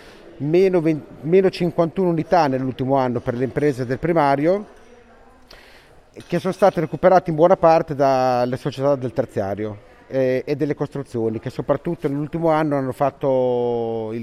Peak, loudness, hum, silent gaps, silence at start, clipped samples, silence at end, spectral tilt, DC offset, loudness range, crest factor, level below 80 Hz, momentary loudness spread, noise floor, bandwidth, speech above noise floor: -2 dBFS; -20 LUFS; none; none; 0.05 s; under 0.1%; 0 s; -8 dB/octave; under 0.1%; 5 LU; 18 dB; -50 dBFS; 9 LU; -48 dBFS; 13.5 kHz; 29 dB